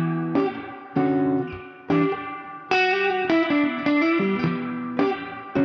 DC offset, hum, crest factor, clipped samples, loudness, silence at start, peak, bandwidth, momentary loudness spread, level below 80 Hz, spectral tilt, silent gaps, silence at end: under 0.1%; none; 18 dB; under 0.1%; -23 LUFS; 0 s; -6 dBFS; 6.4 kHz; 11 LU; -60 dBFS; -7.5 dB/octave; none; 0 s